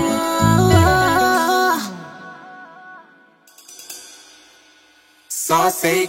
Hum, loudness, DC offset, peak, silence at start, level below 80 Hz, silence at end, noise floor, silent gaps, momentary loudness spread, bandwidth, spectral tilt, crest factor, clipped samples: none; -16 LUFS; under 0.1%; 0 dBFS; 0 s; -40 dBFS; 0 s; -53 dBFS; none; 25 LU; 16.5 kHz; -4.5 dB/octave; 18 dB; under 0.1%